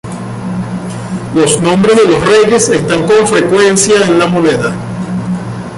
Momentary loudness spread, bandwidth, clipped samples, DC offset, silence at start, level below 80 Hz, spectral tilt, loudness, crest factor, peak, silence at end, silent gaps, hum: 12 LU; 11.5 kHz; under 0.1%; under 0.1%; 0.05 s; -40 dBFS; -4.5 dB/octave; -10 LUFS; 10 dB; 0 dBFS; 0 s; none; none